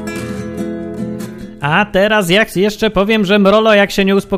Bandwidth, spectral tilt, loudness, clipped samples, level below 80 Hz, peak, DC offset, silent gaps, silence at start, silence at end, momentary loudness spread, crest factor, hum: 16 kHz; -5 dB/octave; -13 LUFS; under 0.1%; -38 dBFS; 0 dBFS; under 0.1%; none; 0 s; 0 s; 14 LU; 14 dB; none